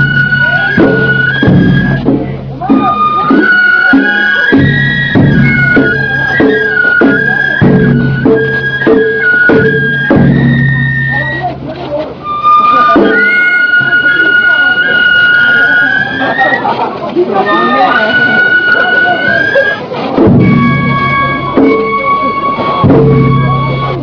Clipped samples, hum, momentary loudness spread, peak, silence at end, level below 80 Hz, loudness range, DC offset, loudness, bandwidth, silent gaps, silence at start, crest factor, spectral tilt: 2%; none; 6 LU; 0 dBFS; 0 s; -32 dBFS; 3 LU; under 0.1%; -7 LUFS; 5.4 kHz; none; 0 s; 8 dB; -8 dB/octave